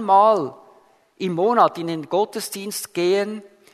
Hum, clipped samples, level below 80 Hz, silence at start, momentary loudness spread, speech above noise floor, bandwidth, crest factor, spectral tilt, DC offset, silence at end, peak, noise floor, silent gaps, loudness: none; under 0.1%; -74 dBFS; 0 s; 13 LU; 35 dB; 13.5 kHz; 18 dB; -4.5 dB/octave; under 0.1%; 0.3 s; -2 dBFS; -54 dBFS; none; -21 LUFS